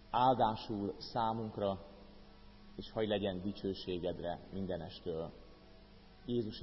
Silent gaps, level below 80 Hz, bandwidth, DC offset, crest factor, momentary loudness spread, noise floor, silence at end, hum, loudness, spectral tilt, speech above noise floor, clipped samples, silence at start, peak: none; -60 dBFS; 5.8 kHz; under 0.1%; 20 dB; 18 LU; -58 dBFS; 0 s; none; -38 LUFS; -5 dB/octave; 21 dB; under 0.1%; 0 s; -18 dBFS